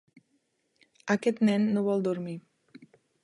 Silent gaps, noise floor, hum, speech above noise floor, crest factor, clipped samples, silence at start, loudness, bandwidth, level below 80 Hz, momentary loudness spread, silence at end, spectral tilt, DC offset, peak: none; -74 dBFS; none; 47 dB; 20 dB; under 0.1%; 1.05 s; -28 LUFS; 11 kHz; -76 dBFS; 16 LU; 0.85 s; -7 dB/octave; under 0.1%; -10 dBFS